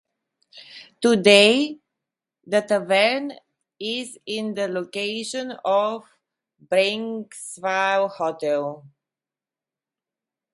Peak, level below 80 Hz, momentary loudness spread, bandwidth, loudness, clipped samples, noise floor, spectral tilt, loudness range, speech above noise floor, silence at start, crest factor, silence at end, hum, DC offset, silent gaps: -2 dBFS; -74 dBFS; 17 LU; 11.5 kHz; -21 LUFS; under 0.1%; under -90 dBFS; -3.5 dB/octave; 7 LU; over 69 dB; 0.55 s; 22 dB; 1.65 s; none; under 0.1%; none